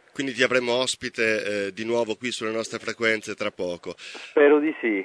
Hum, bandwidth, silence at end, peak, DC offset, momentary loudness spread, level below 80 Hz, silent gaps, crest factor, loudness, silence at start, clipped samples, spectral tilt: none; 11 kHz; 0 s; -6 dBFS; under 0.1%; 12 LU; -68 dBFS; none; 18 dB; -24 LUFS; 0.15 s; under 0.1%; -3.5 dB/octave